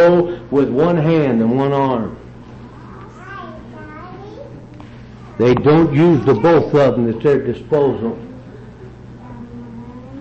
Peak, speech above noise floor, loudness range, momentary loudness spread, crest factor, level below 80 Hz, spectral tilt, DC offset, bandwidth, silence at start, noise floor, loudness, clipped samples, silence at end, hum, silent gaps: -4 dBFS; 22 dB; 11 LU; 25 LU; 12 dB; -44 dBFS; -9 dB/octave; under 0.1%; 7.6 kHz; 0 s; -36 dBFS; -15 LUFS; under 0.1%; 0 s; none; none